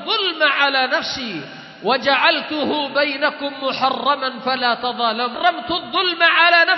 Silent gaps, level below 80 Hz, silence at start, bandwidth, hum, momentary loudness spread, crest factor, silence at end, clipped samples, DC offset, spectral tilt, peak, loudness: none; -62 dBFS; 0 s; 6.2 kHz; none; 10 LU; 18 dB; 0 s; under 0.1%; under 0.1%; -3 dB/octave; -2 dBFS; -18 LUFS